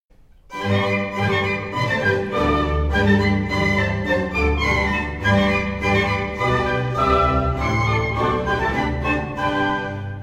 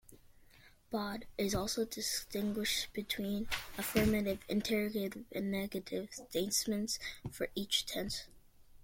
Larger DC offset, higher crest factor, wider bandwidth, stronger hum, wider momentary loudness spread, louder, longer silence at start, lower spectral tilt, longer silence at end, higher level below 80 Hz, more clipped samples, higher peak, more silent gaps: neither; about the same, 16 dB vs 20 dB; about the same, 15 kHz vs 16.5 kHz; neither; second, 5 LU vs 8 LU; first, -20 LUFS vs -37 LUFS; first, 0.5 s vs 0.1 s; first, -6.5 dB/octave vs -3.5 dB/octave; about the same, 0 s vs 0 s; first, -32 dBFS vs -56 dBFS; neither; first, -4 dBFS vs -18 dBFS; neither